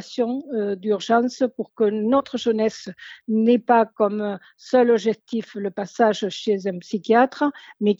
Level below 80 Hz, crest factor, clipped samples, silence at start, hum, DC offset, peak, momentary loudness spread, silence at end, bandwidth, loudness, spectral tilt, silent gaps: -70 dBFS; 16 dB; under 0.1%; 0 s; none; under 0.1%; -6 dBFS; 11 LU; 0.05 s; 7.8 kHz; -22 LUFS; -5.5 dB/octave; none